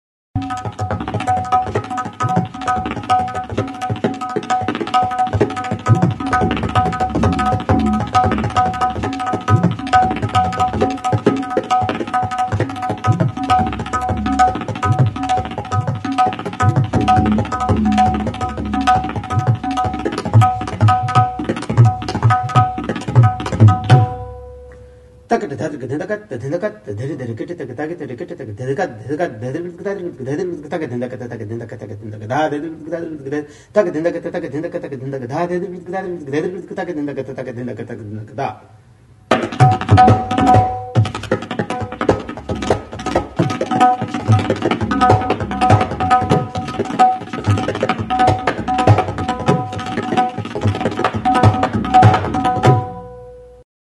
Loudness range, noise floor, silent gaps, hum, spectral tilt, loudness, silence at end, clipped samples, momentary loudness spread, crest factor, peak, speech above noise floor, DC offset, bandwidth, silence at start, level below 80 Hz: 9 LU; -46 dBFS; none; none; -7 dB/octave; -17 LUFS; 0.35 s; under 0.1%; 12 LU; 16 dB; 0 dBFS; 26 dB; under 0.1%; 11.5 kHz; 0.35 s; -38 dBFS